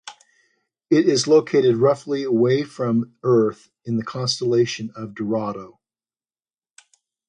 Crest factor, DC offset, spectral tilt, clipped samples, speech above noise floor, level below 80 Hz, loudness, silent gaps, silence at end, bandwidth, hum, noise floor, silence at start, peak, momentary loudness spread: 16 dB; under 0.1%; -5.5 dB/octave; under 0.1%; over 70 dB; -64 dBFS; -20 LUFS; none; 1.6 s; 10 kHz; none; under -90 dBFS; 0.05 s; -4 dBFS; 13 LU